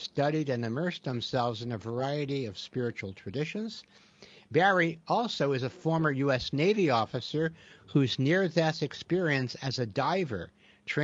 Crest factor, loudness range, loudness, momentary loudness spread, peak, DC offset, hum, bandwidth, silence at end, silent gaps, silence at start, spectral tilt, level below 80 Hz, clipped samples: 20 dB; 6 LU; -30 LUFS; 10 LU; -10 dBFS; under 0.1%; none; 7.8 kHz; 0 s; none; 0 s; -6 dB/octave; -64 dBFS; under 0.1%